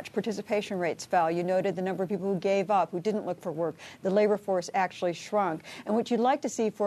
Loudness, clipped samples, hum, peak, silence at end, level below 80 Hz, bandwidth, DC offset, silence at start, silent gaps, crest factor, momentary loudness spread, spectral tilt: -29 LUFS; under 0.1%; none; -12 dBFS; 0 s; -74 dBFS; 13.5 kHz; under 0.1%; 0 s; none; 16 dB; 7 LU; -5.5 dB/octave